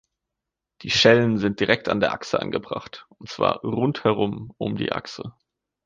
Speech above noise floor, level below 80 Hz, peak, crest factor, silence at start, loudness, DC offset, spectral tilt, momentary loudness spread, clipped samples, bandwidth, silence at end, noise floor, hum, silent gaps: 62 dB; -56 dBFS; -2 dBFS; 22 dB; 0.8 s; -22 LUFS; under 0.1%; -5 dB/octave; 21 LU; under 0.1%; 9.2 kHz; 0.55 s; -85 dBFS; none; none